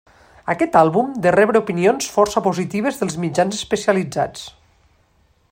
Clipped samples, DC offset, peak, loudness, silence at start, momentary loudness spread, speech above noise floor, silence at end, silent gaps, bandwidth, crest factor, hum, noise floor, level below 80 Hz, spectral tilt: under 0.1%; under 0.1%; 0 dBFS; -18 LUFS; 0.45 s; 10 LU; 41 dB; 1 s; none; 16.5 kHz; 18 dB; none; -59 dBFS; -54 dBFS; -5 dB/octave